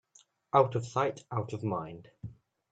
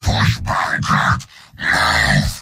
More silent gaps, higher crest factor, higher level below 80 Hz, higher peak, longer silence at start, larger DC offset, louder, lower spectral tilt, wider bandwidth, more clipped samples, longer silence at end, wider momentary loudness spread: neither; first, 22 dB vs 14 dB; second, -66 dBFS vs -30 dBFS; second, -10 dBFS vs -2 dBFS; first, 0.55 s vs 0 s; neither; second, -31 LUFS vs -16 LUFS; first, -7 dB/octave vs -4 dB/octave; second, 9 kHz vs 16 kHz; neither; first, 0.4 s vs 0 s; first, 22 LU vs 6 LU